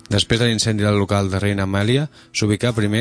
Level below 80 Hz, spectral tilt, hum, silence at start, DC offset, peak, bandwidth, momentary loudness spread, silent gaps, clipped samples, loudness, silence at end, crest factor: -44 dBFS; -5 dB/octave; none; 0.1 s; under 0.1%; -4 dBFS; 11 kHz; 4 LU; none; under 0.1%; -19 LUFS; 0 s; 16 dB